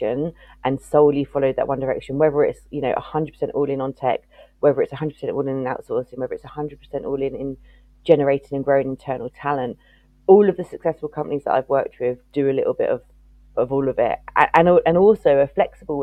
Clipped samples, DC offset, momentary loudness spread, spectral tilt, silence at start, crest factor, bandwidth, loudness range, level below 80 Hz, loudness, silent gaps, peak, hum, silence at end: under 0.1%; under 0.1%; 14 LU; -8 dB/octave; 0 s; 20 dB; 9.8 kHz; 6 LU; -50 dBFS; -21 LUFS; none; 0 dBFS; none; 0 s